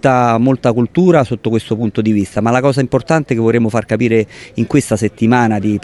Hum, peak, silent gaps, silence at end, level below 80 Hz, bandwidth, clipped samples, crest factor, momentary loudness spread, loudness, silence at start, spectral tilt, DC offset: none; 0 dBFS; none; 0.05 s; -44 dBFS; 12 kHz; under 0.1%; 12 dB; 5 LU; -14 LUFS; 0.05 s; -7 dB/octave; under 0.1%